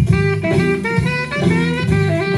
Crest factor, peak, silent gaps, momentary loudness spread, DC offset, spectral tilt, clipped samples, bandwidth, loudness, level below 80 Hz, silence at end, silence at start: 14 dB; -2 dBFS; none; 2 LU; under 0.1%; -7 dB/octave; under 0.1%; 12 kHz; -16 LUFS; -34 dBFS; 0 s; 0 s